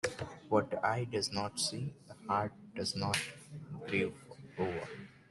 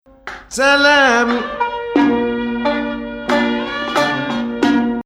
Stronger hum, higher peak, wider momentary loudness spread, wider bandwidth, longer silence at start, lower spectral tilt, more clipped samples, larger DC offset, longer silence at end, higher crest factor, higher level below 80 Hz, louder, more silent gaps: neither; second, -16 dBFS vs 0 dBFS; about the same, 14 LU vs 12 LU; second, 12 kHz vs 15 kHz; second, 0.05 s vs 0.25 s; about the same, -4 dB/octave vs -3.5 dB/octave; neither; neither; about the same, 0.15 s vs 0.05 s; first, 22 dB vs 16 dB; second, -68 dBFS vs -46 dBFS; second, -36 LUFS vs -16 LUFS; neither